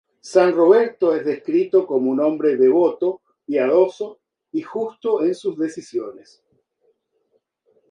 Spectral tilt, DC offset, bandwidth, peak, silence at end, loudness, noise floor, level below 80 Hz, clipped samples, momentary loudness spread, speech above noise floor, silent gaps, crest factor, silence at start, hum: -6.5 dB/octave; under 0.1%; 10 kHz; -2 dBFS; 1.8 s; -19 LUFS; -68 dBFS; -74 dBFS; under 0.1%; 14 LU; 50 dB; none; 18 dB; 0.25 s; none